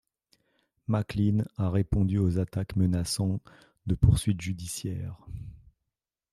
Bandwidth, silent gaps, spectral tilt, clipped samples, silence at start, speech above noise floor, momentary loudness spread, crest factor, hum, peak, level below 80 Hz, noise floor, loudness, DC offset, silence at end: 13.5 kHz; none; -6.5 dB/octave; under 0.1%; 0.9 s; 60 dB; 18 LU; 22 dB; none; -8 dBFS; -42 dBFS; -87 dBFS; -28 LUFS; under 0.1%; 0.75 s